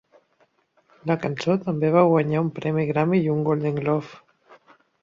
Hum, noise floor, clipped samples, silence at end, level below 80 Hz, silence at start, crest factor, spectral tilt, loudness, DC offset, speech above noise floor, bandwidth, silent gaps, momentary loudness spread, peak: none; -65 dBFS; under 0.1%; 0.85 s; -64 dBFS; 1.05 s; 18 dB; -8.5 dB/octave; -22 LUFS; under 0.1%; 43 dB; 7.4 kHz; none; 8 LU; -6 dBFS